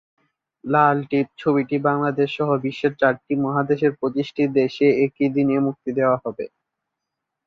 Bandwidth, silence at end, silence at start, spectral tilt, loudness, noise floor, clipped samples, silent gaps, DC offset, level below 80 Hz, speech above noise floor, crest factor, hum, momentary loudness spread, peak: 6.6 kHz; 1 s; 0.65 s; -8.5 dB/octave; -21 LUFS; -82 dBFS; under 0.1%; none; under 0.1%; -64 dBFS; 62 dB; 18 dB; none; 6 LU; -4 dBFS